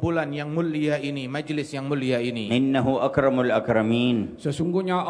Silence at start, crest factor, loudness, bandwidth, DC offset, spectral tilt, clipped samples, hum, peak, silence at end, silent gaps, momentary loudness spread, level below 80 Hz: 0 s; 16 dB; -24 LUFS; 10.5 kHz; under 0.1%; -7 dB/octave; under 0.1%; none; -6 dBFS; 0 s; none; 7 LU; -54 dBFS